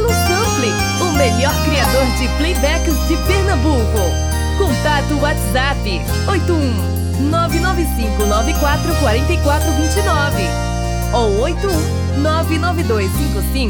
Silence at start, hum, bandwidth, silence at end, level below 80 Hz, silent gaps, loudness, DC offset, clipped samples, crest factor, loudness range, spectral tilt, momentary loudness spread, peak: 0 s; none; over 20 kHz; 0 s; -22 dBFS; none; -16 LUFS; under 0.1%; under 0.1%; 14 dB; 2 LU; -5 dB/octave; 4 LU; 0 dBFS